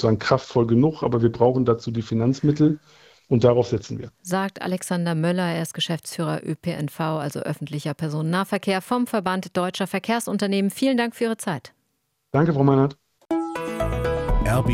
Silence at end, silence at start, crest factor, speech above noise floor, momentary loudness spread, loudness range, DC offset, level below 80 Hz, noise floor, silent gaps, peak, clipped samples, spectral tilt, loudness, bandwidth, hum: 0 s; 0 s; 20 dB; 51 dB; 9 LU; 5 LU; under 0.1%; -38 dBFS; -73 dBFS; none; -2 dBFS; under 0.1%; -6.5 dB/octave; -23 LUFS; 16.5 kHz; none